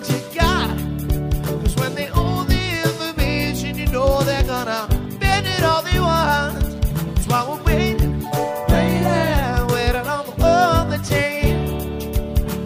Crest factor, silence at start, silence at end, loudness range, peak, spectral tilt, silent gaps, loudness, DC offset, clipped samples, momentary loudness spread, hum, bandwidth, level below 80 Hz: 16 dB; 0 s; 0 s; 2 LU; -4 dBFS; -5.5 dB/octave; none; -20 LUFS; under 0.1%; under 0.1%; 6 LU; none; 16 kHz; -24 dBFS